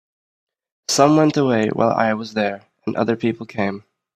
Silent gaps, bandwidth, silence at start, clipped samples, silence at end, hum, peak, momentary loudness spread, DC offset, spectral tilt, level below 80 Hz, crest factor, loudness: none; 14.5 kHz; 0.9 s; under 0.1%; 0.4 s; none; 0 dBFS; 12 LU; under 0.1%; -5 dB/octave; -60 dBFS; 20 dB; -19 LUFS